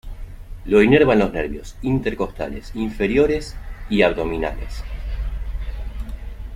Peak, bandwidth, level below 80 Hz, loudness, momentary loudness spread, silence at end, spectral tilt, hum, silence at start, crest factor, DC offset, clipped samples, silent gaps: -2 dBFS; 15 kHz; -30 dBFS; -20 LUFS; 21 LU; 0 s; -7 dB/octave; none; 0.05 s; 18 dB; under 0.1%; under 0.1%; none